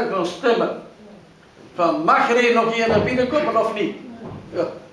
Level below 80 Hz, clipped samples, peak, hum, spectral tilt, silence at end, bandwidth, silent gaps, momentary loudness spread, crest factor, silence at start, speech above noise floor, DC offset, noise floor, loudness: -54 dBFS; under 0.1%; -4 dBFS; none; -5.5 dB/octave; 0.05 s; 11 kHz; none; 19 LU; 16 dB; 0 s; 27 dB; under 0.1%; -46 dBFS; -19 LUFS